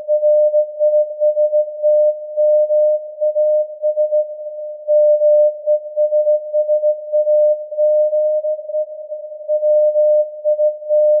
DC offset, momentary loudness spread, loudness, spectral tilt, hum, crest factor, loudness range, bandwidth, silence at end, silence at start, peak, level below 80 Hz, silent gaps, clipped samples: under 0.1%; 8 LU; -16 LUFS; -8.5 dB/octave; none; 8 dB; 2 LU; 0.7 kHz; 0 s; 0 s; -6 dBFS; under -90 dBFS; none; under 0.1%